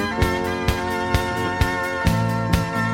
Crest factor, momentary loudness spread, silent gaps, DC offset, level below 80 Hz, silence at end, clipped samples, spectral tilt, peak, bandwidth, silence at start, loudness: 16 dB; 2 LU; none; under 0.1%; -30 dBFS; 0 s; under 0.1%; -5.5 dB/octave; -4 dBFS; 17 kHz; 0 s; -22 LUFS